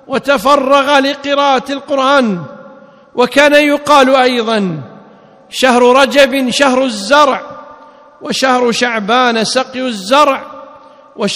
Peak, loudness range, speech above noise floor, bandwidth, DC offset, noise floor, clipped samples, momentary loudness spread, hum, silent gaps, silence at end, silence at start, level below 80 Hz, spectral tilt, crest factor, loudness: 0 dBFS; 3 LU; 30 dB; 15.5 kHz; under 0.1%; -40 dBFS; 1%; 13 LU; none; none; 0 s; 0.1 s; -52 dBFS; -3.5 dB/octave; 12 dB; -11 LUFS